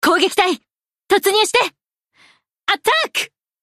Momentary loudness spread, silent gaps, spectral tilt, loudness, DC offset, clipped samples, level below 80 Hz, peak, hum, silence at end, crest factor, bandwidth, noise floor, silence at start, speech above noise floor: 10 LU; none; -1 dB/octave; -17 LUFS; under 0.1%; under 0.1%; -60 dBFS; -4 dBFS; none; 0.35 s; 16 dB; 15.5 kHz; -55 dBFS; 0 s; 39 dB